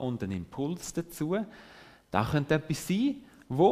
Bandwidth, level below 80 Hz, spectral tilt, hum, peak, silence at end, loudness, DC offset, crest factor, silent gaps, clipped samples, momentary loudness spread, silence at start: 15.5 kHz; -56 dBFS; -6 dB/octave; none; -8 dBFS; 0 s; -31 LUFS; under 0.1%; 22 dB; none; under 0.1%; 13 LU; 0 s